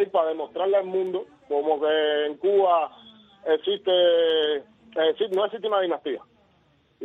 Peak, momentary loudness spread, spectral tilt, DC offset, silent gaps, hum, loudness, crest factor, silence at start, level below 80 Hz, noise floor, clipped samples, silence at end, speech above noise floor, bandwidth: -8 dBFS; 12 LU; -5.5 dB/octave; under 0.1%; none; none; -24 LUFS; 16 dB; 0 s; -72 dBFS; -63 dBFS; under 0.1%; 0 s; 40 dB; 4 kHz